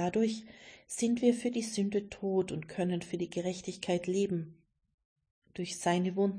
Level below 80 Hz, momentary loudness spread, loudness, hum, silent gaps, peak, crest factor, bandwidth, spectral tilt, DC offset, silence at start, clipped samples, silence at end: -68 dBFS; 12 LU; -33 LUFS; none; 4.94-4.98 s, 5.05-5.16 s, 5.31-5.42 s; -16 dBFS; 18 dB; 10.5 kHz; -5.5 dB/octave; under 0.1%; 0 s; under 0.1%; 0 s